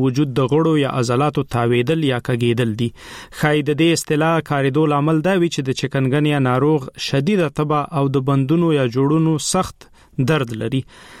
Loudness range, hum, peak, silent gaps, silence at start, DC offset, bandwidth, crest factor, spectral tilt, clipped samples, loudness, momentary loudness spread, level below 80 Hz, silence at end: 1 LU; none; -2 dBFS; none; 0 s; under 0.1%; 15 kHz; 14 dB; -6 dB/octave; under 0.1%; -18 LUFS; 6 LU; -48 dBFS; 0 s